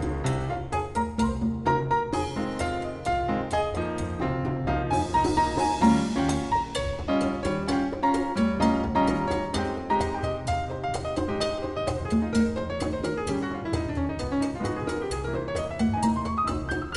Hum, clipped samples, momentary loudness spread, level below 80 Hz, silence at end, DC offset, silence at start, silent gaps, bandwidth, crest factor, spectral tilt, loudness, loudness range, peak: none; under 0.1%; 6 LU; -38 dBFS; 0 s; under 0.1%; 0 s; none; 12 kHz; 18 dB; -6 dB/octave; -27 LUFS; 3 LU; -10 dBFS